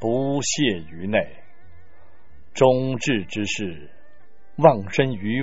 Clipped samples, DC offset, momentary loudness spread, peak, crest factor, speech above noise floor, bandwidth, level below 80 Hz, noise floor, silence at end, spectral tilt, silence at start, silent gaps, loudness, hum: under 0.1%; 2%; 16 LU; 0 dBFS; 22 dB; 36 dB; 8 kHz; -56 dBFS; -58 dBFS; 0 s; -4.5 dB/octave; 0 s; none; -22 LUFS; none